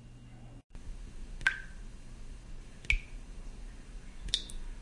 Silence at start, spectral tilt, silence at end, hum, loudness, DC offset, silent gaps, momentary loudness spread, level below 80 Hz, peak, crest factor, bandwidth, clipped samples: 0 s; -2 dB/octave; 0 s; none; -35 LUFS; under 0.1%; 0.64-0.70 s; 20 LU; -44 dBFS; -10 dBFS; 30 dB; 11.5 kHz; under 0.1%